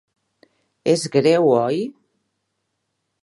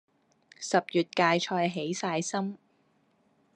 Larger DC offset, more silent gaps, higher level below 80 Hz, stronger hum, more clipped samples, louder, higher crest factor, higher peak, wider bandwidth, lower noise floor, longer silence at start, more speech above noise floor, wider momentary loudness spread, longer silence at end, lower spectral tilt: neither; neither; first, -70 dBFS vs -82 dBFS; neither; neither; first, -18 LUFS vs -29 LUFS; about the same, 20 dB vs 22 dB; first, -2 dBFS vs -10 dBFS; about the same, 11.5 kHz vs 11 kHz; first, -75 dBFS vs -69 dBFS; first, 0.85 s vs 0.6 s; first, 58 dB vs 40 dB; about the same, 11 LU vs 12 LU; first, 1.3 s vs 1 s; first, -5.5 dB/octave vs -4 dB/octave